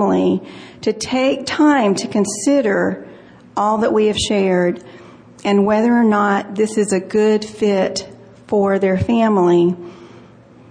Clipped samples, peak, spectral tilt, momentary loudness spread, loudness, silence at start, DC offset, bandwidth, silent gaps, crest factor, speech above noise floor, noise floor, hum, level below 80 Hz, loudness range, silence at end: under 0.1%; -4 dBFS; -5.5 dB/octave; 10 LU; -16 LUFS; 0 s; under 0.1%; 10.5 kHz; none; 12 dB; 28 dB; -43 dBFS; none; -50 dBFS; 1 LU; 0.5 s